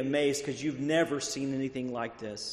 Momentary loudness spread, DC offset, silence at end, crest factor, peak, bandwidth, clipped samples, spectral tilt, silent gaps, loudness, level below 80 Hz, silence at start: 8 LU; under 0.1%; 0 s; 16 dB; -14 dBFS; 13 kHz; under 0.1%; -4 dB/octave; none; -32 LUFS; -66 dBFS; 0 s